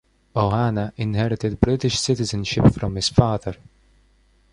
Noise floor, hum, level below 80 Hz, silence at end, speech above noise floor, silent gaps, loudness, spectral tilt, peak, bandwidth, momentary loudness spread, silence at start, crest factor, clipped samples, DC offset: -58 dBFS; none; -38 dBFS; 1 s; 38 dB; none; -21 LUFS; -6 dB/octave; -2 dBFS; 11 kHz; 9 LU; 0.35 s; 20 dB; under 0.1%; under 0.1%